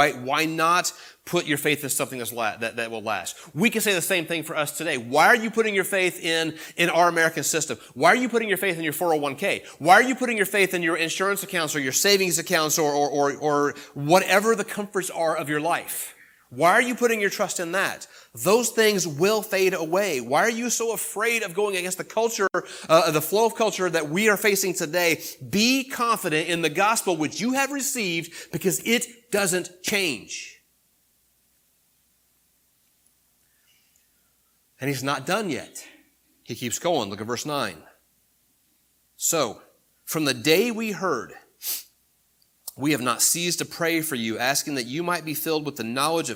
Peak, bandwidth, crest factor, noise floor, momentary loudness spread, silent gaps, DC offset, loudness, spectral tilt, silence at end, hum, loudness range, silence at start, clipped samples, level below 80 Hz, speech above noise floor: -2 dBFS; 19 kHz; 24 dB; -66 dBFS; 10 LU; none; under 0.1%; -23 LUFS; -3 dB/octave; 0 s; none; 8 LU; 0 s; under 0.1%; -70 dBFS; 42 dB